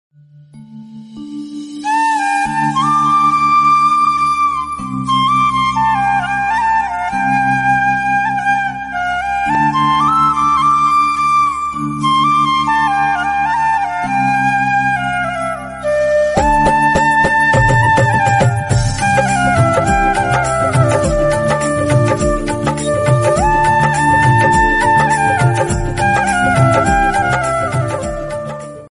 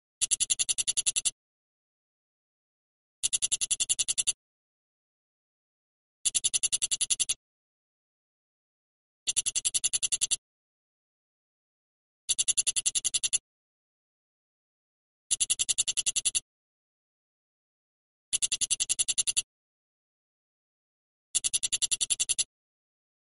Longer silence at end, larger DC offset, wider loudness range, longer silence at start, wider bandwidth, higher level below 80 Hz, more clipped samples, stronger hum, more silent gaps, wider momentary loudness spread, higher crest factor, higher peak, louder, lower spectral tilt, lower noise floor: second, 0.05 s vs 0.9 s; neither; about the same, 3 LU vs 1 LU; first, 0.55 s vs 0.2 s; about the same, 11.5 kHz vs 11.5 kHz; first, -30 dBFS vs -64 dBFS; neither; neither; second, none vs 1.32-3.23 s, 4.34-6.25 s, 7.36-9.26 s, 10.38-12.28 s, 13.40-15.30 s, 16.42-18.32 s, 19.43-21.34 s; about the same, 7 LU vs 6 LU; second, 12 dB vs 24 dB; first, -2 dBFS vs -8 dBFS; first, -13 LUFS vs -27 LUFS; first, -5 dB/octave vs 3 dB/octave; second, -40 dBFS vs under -90 dBFS